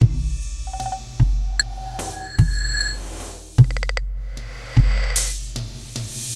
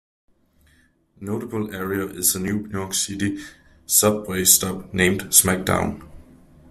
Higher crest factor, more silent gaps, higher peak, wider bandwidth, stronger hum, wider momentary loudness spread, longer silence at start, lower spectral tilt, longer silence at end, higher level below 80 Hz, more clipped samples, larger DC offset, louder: about the same, 20 dB vs 24 dB; neither; about the same, 0 dBFS vs 0 dBFS; second, 13 kHz vs 16 kHz; neither; about the same, 14 LU vs 14 LU; second, 0 s vs 1.2 s; about the same, -4 dB/octave vs -3 dB/octave; second, 0 s vs 0.5 s; first, -24 dBFS vs -50 dBFS; neither; neither; second, -23 LUFS vs -20 LUFS